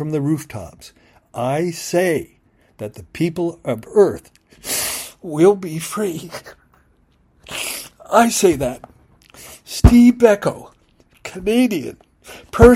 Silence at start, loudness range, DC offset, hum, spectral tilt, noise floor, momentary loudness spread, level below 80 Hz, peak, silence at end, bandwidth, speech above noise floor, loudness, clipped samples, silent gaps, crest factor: 0 s; 7 LU; under 0.1%; none; -5.5 dB/octave; -57 dBFS; 21 LU; -30 dBFS; 0 dBFS; 0 s; 16 kHz; 41 dB; -17 LUFS; 0.2%; none; 18 dB